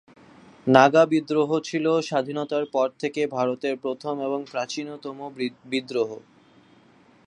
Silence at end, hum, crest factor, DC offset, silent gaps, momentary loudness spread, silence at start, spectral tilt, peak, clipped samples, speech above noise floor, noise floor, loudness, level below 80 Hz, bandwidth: 1.05 s; none; 24 dB; under 0.1%; none; 14 LU; 0.65 s; -5.5 dB/octave; 0 dBFS; under 0.1%; 32 dB; -56 dBFS; -24 LUFS; -70 dBFS; 10.5 kHz